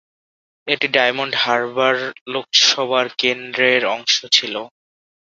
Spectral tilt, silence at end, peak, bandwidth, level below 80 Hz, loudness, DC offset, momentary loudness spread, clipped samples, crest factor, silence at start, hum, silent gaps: -1 dB/octave; 0.6 s; 0 dBFS; 7.8 kHz; -68 dBFS; -17 LUFS; under 0.1%; 11 LU; under 0.1%; 18 dB; 0.65 s; none; 2.21-2.26 s